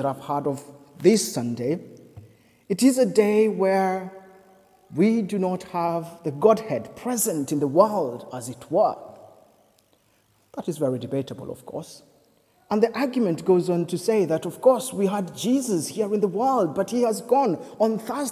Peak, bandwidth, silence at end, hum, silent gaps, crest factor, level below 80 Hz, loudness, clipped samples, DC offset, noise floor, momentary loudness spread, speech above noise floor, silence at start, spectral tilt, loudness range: -4 dBFS; 16 kHz; 0 s; none; none; 20 dB; -68 dBFS; -23 LUFS; under 0.1%; under 0.1%; -63 dBFS; 14 LU; 41 dB; 0 s; -5.5 dB/octave; 6 LU